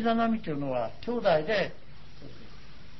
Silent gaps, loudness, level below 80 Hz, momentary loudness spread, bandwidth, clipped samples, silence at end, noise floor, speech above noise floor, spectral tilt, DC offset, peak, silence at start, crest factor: none; -29 LUFS; -54 dBFS; 23 LU; 6 kHz; under 0.1%; 0.05 s; -50 dBFS; 22 dB; -7 dB/octave; 1%; -12 dBFS; 0 s; 18 dB